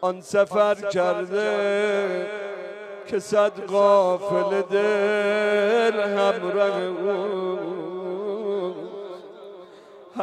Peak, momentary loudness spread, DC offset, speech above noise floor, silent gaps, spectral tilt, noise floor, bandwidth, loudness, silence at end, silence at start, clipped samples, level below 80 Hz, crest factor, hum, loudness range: -6 dBFS; 16 LU; under 0.1%; 24 dB; none; -5 dB/octave; -46 dBFS; 11.5 kHz; -23 LUFS; 0 s; 0 s; under 0.1%; -76 dBFS; 16 dB; none; 6 LU